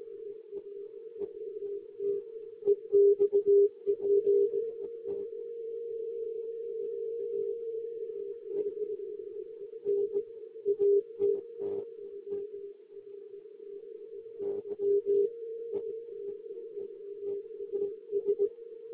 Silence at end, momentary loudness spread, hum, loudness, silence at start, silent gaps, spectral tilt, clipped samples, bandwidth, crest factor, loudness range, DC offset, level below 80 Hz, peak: 0 s; 19 LU; none; -32 LUFS; 0 s; none; -9 dB/octave; under 0.1%; 1.3 kHz; 16 dB; 10 LU; under 0.1%; -80 dBFS; -16 dBFS